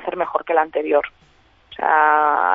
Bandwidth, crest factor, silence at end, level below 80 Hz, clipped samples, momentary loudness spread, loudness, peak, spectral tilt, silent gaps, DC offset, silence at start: 4 kHz; 16 dB; 0 s; -60 dBFS; under 0.1%; 9 LU; -18 LUFS; -2 dBFS; -6.5 dB/octave; none; under 0.1%; 0 s